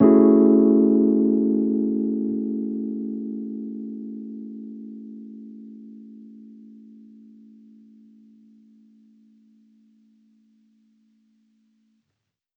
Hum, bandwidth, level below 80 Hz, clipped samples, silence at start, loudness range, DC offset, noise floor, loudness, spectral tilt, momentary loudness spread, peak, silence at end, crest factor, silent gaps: none; 2.2 kHz; -66 dBFS; under 0.1%; 0 s; 26 LU; under 0.1%; -80 dBFS; -20 LUFS; -12.5 dB/octave; 27 LU; -4 dBFS; 6.3 s; 20 dB; none